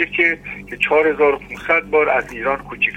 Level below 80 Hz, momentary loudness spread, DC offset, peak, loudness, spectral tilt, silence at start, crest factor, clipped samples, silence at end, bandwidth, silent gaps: -46 dBFS; 9 LU; under 0.1%; -2 dBFS; -17 LUFS; -5 dB/octave; 0 s; 18 dB; under 0.1%; 0 s; 9 kHz; none